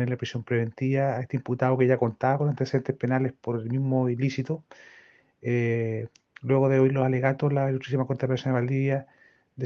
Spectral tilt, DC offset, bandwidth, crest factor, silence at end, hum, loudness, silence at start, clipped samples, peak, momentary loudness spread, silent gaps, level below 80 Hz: -8.5 dB/octave; under 0.1%; 6.8 kHz; 18 dB; 0 s; none; -26 LUFS; 0 s; under 0.1%; -8 dBFS; 9 LU; none; -68 dBFS